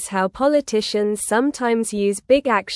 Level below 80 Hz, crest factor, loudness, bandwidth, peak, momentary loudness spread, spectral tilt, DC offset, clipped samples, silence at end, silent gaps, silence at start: -54 dBFS; 16 dB; -20 LUFS; 12 kHz; -4 dBFS; 4 LU; -4 dB/octave; under 0.1%; under 0.1%; 0 s; none; 0 s